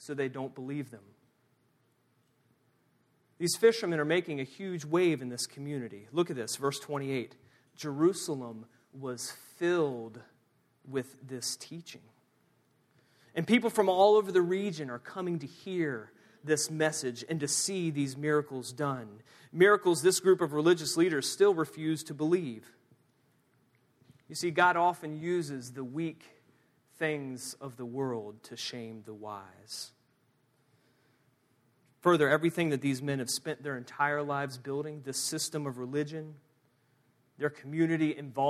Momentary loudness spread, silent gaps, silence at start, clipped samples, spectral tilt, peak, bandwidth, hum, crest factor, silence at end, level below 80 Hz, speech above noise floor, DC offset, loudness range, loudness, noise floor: 16 LU; none; 0 s; under 0.1%; -4.5 dB/octave; -10 dBFS; 15 kHz; none; 22 dB; 0 s; -80 dBFS; 41 dB; under 0.1%; 11 LU; -31 LUFS; -72 dBFS